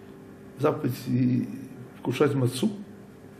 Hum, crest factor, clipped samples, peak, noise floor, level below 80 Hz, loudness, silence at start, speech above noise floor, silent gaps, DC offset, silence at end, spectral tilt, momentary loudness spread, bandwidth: none; 18 dB; under 0.1%; -10 dBFS; -46 dBFS; -66 dBFS; -27 LUFS; 0 s; 21 dB; none; under 0.1%; 0 s; -7 dB/octave; 22 LU; 14.5 kHz